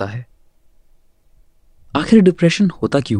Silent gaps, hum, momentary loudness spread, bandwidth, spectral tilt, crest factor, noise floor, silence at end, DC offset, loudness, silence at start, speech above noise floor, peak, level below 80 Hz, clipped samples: none; none; 15 LU; 10.5 kHz; -6.5 dB/octave; 16 dB; -51 dBFS; 0 s; under 0.1%; -15 LUFS; 0 s; 37 dB; 0 dBFS; -46 dBFS; under 0.1%